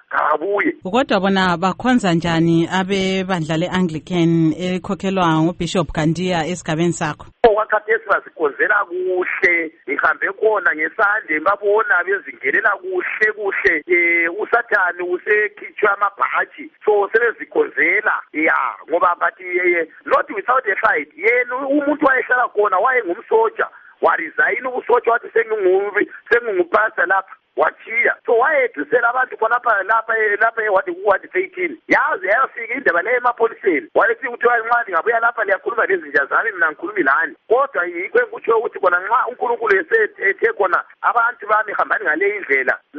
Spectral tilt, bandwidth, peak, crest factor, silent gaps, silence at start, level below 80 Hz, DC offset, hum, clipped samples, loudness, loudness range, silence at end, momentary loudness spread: -6 dB/octave; 8.4 kHz; -2 dBFS; 16 dB; none; 0.1 s; -52 dBFS; under 0.1%; none; under 0.1%; -17 LUFS; 1 LU; 0 s; 5 LU